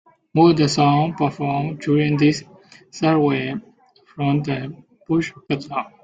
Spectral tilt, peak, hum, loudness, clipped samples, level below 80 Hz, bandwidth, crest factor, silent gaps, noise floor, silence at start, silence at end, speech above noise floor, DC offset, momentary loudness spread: -6.5 dB/octave; -2 dBFS; none; -20 LUFS; under 0.1%; -58 dBFS; 9.2 kHz; 18 dB; none; -52 dBFS; 0.35 s; 0.15 s; 33 dB; under 0.1%; 12 LU